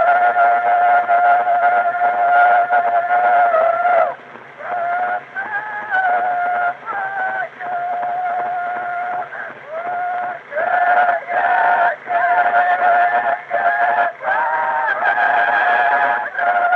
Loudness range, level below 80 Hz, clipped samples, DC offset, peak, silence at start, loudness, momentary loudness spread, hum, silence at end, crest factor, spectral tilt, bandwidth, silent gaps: 7 LU; -76 dBFS; under 0.1%; under 0.1%; -2 dBFS; 0 s; -16 LUFS; 10 LU; none; 0 s; 14 dB; -4.5 dB/octave; 4.5 kHz; none